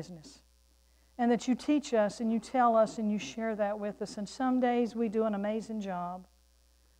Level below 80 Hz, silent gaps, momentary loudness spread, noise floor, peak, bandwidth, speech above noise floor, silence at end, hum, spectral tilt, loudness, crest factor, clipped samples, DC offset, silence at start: -66 dBFS; none; 12 LU; -65 dBFS; -16 dBFS; 10.5 kHz; 34 dB; 0.75 s; none; -5.5 dB/octave; -31 LUFS; 16 dB; under 0.1%; under 0.1%; 0 s